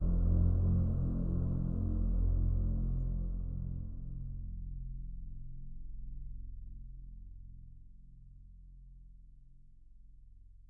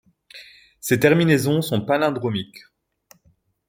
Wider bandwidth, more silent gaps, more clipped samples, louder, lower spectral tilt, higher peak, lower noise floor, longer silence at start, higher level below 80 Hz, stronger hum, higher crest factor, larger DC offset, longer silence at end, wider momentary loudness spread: second, 1.5 kHz vs 17 kHz; neither; neither; second, -36 LUFS vs -20 LUFS; first, -13.5 dB/octave vs -5.5 dB/octave; second, -20 dBFS vs -2 dBFS; second, -56 dBFS vs -62 dBFS; second, 0 s vs 0.35 s; first, -38 dBFS vs -60 dBFS; neither; second, 14 dB vs 20 dB; neither; second, 0.05 s vs 1.1 s; about the same, 26 LU vs 24 LU